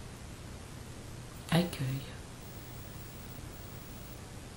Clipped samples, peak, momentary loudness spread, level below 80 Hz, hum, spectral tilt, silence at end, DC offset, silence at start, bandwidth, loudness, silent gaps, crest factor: under 0.1%; -16 dBFS; 15 LU; -52 dBFS; none; -5.5 dB/octave; 0 s; under 0.1%; 0 s; 16.5 kHz; -40 LUFS; none; 24 dB